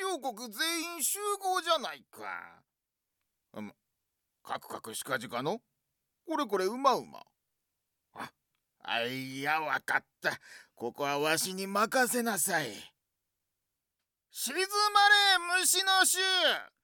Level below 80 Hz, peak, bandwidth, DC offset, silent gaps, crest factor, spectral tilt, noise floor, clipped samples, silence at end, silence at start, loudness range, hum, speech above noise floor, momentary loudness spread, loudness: -82 dBFS; -12 dBFS; 19 kHz; under 0.1%; none; 20 dB; -1 dB/octave; -87 dBFS; under 0.1%; 0.15 s; 0 s; 13 LU; none; 56 dB; 20 LU; -29 LUFS